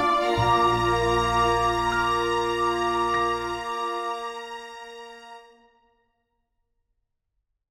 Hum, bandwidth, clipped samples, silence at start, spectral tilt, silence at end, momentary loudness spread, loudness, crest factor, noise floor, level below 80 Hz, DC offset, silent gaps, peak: none; 16 kHz; under 0.1%; 0 s; -5 dB/octave; 2.3 s; 18 LU; -24 LUFS; 16 dB; -78 dBFS; -44 dBFS; under 0.1%; none; -10 dBFS